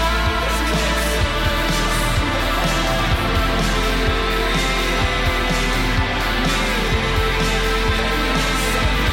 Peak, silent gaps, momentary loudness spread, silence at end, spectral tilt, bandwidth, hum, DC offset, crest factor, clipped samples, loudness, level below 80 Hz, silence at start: -6 dBFS; none; 1 LU; 0 s; -4 dB/octave; 17 kHz; none; under 0.1%; 12 dB; under 0.1%; -19 LUFS; -22 dBFS; 0 s